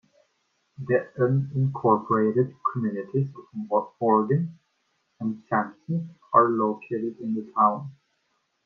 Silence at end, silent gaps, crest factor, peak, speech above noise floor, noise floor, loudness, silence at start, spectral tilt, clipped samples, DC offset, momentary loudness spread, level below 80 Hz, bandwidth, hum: 0.75 s; none; 22 dB; -4 dBFS; 49 dB; -73 dBFS; -25 LUFS; 0.8 s; -11.5 dB/octave; under 0.1%; under 0.1%; 11 LU; -70 dBFS; 3.9 kHz; none